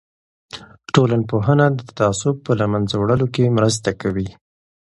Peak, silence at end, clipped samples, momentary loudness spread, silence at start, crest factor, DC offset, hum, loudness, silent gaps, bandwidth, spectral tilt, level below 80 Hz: 0 dBFS; 0.55 s; under 0.1%; 15 LU; 0.55 s; 18 dB; under 0.1%; none; -18 LUFS; none; 11.5 kHz; -6 dB/octave; -46 dBFS